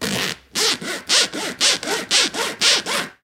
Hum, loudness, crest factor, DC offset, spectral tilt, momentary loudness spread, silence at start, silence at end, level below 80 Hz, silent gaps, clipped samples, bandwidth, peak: none; -18 LUFS; 20 dB; under 0.1%; -0.5 dB/octave; 8 LU; 0 s; 0.1 s; -58 dBFS; none; under 0.1%; 17 kHz; 0 dBFS